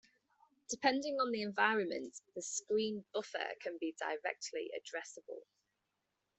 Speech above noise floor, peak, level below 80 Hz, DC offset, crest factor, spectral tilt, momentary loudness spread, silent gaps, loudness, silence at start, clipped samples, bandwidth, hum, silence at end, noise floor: 47 dB; -14 dBFS; -84 dBFS; under 0.1%; 24 dB; -2.5 dB/octave; 13 LU; none; -38 LUFS; 0.7 s; under 0.1%; 8.4 kHz; none; 0.95 s; -86 dBFS